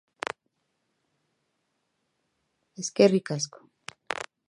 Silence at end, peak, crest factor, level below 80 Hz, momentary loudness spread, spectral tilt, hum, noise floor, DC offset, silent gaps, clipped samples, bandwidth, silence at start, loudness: 0.25 s; -6 dBFS; 26 dB; -78 dBFS; 24 LU; -4.5 dB/octave; none; -77 dBFS; under 0.1%; none; under 0.1%; 11 kHz; 2.8 s; -27 LUFS